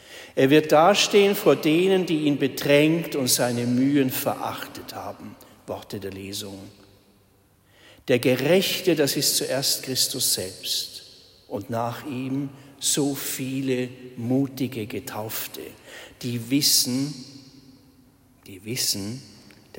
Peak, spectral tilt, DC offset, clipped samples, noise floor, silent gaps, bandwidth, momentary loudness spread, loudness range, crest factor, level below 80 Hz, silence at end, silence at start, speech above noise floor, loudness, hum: -6 dBFS; -3.5 dB/octave; under 0.1%; under 0.1%; -60 dBFS; none; 16.5 kHz; 18 LU; 9 LU; 20 dB; -66 dBFS; 0.5 s; 0.1 s; 36 dB; -22 LUFS; none